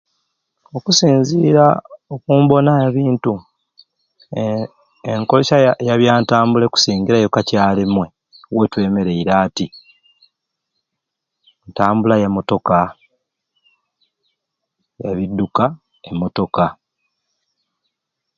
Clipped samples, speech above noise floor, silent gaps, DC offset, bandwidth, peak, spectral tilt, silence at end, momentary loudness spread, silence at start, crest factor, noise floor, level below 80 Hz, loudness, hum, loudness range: under 0.1%; 65 dB; none; under 0.1%; 7.6 kHz; 0 dBFS; -5.5 dB/octave; 1.65 s; 15 LU; 0.75 s; 18 dB; -79 dBFS; -50 dBFS; -15 LUFS; none; 8 LU